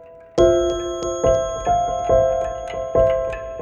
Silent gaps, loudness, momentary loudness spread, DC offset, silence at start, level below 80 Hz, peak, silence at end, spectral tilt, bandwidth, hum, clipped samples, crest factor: none; -20 LUFS; 10 LU; under 0.1%; 0 s; -36 dBFS; -2 dBFS; 0 s; -5.5 dB/octave; 7.8 kHz; none; under 0.1%; 16 dB